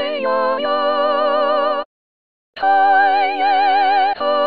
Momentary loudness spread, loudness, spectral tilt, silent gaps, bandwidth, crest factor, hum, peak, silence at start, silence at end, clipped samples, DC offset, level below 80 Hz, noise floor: 7 LU; -16 LUFS; -5 dB/octave; 1.86-2.53 s; 5 kHz; 12 dB; none; -4 dBFS; 0 s; 0 s; under 0.1%; 1%; -64 dBFS; under -90 dBFS